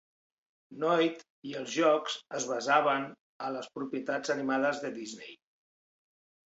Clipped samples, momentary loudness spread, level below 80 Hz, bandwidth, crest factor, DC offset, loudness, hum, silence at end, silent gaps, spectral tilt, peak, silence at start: under 0.1%; 16 LU; -80 dBFS; 8 kHz; 22 dB; under 0.1%; -31 LUFS; none; 1.15 s; 1.30-1.42 s, 3.20-3.40 s; -3.5 dB/octave; -10 dBFS; 0.7 s